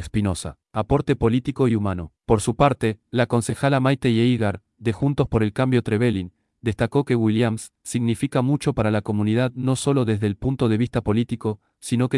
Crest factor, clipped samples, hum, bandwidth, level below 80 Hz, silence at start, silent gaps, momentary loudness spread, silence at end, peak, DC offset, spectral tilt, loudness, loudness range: 16 dB; under 0.1%; none; 12 kHz; -44 dBFS; 0 s; none; 9 LU; 0 s; -4 dBFS; under 0.1%; -6.5 dB/octave; -22 LUFS; 1 LU